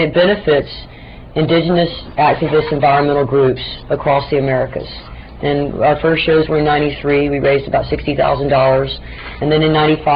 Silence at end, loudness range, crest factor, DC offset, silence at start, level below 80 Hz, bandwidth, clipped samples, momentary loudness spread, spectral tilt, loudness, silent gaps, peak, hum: 0 s; 2 LU; 12 dB; 0.2%; 0 s; -34 dBFS; 5.2 kHz; under 0.1%; 11 LU; -10 dB/octave; -14 LUFS; none; -2 dBFS; none